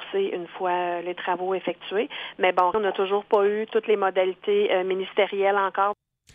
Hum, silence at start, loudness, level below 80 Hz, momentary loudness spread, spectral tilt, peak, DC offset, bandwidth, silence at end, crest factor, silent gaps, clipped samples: none; 0 s; -24 LUFS; -70 dBFS; 7 LU; -6.5 dB/octave; -8 dBFS; under 0.1%; 5 kHz; 0.4 s; 16 dB; none; under 0.1%